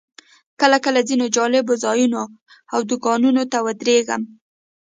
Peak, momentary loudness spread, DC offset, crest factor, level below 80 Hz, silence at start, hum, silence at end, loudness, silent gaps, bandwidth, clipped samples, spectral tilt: 0 dBFS; 9 LU; under 0.1%; 18 dB; -70 dBFS; 0.6 s; none; 0.7 s; -18 LUFS; 2.42-2.46 s; 9.6 kHz; under 0.1%; -2.5 dB/octave